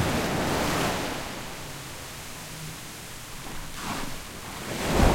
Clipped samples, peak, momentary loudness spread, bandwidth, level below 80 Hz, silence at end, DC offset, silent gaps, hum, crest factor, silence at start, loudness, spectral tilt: under 0.1%; -6 dBFS; 12 LU; 16.5 kHz; -36 dBFS; 0 s; under 0.1%; none; none; 22 dB; 0 s; -31 LUFS; -4 dB/octave